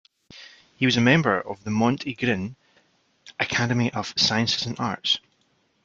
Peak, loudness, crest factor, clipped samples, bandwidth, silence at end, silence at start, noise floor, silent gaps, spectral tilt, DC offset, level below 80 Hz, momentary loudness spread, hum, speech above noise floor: -4 dBFS; -23 LUFS; 22 dB; under 0.1%; 7.6 kHz; 0.65 s; 0.3 s; -67 dBFS; none; -4.5 dB/octave; under 0.1%; -60 dBFS; 10 LU; none; 44 dB